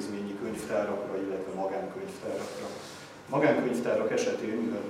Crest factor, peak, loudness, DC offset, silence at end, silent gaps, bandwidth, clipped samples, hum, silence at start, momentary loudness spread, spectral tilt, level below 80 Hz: 20 dB; -10 dBFS; -31 LUFS; under 0.1%; 0 s; none; 16 kHz; under 0.1%; none; 0 s; 13 LU; -5.5 dB/octave; -70 dBFS